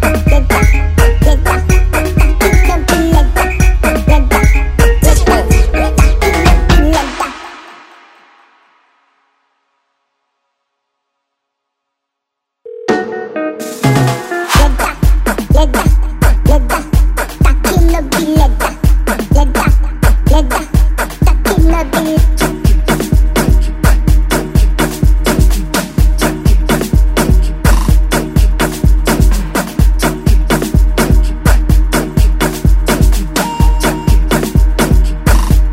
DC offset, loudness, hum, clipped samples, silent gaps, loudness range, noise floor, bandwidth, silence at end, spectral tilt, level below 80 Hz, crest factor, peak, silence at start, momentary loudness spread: under 0.1%; -12 LUFS; none; 0.3%; none; 4 LU; -76 dBFS; 16.5 kHz; 0 s; -5.5 dB/octave; -12 dBFS; 10 dB; 0 dBFS; 0 s; 4 LU